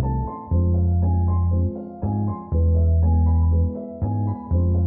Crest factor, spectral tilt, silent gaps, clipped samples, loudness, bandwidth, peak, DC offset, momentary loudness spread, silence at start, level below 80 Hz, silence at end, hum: 8 dB; -16 dB/octave; none; under 0.1%; -22 LUFS; 1.8 kHz; -10 dBFS; under 0.1%; 8 LU; 0 s; -26 dBFS; 0 s; none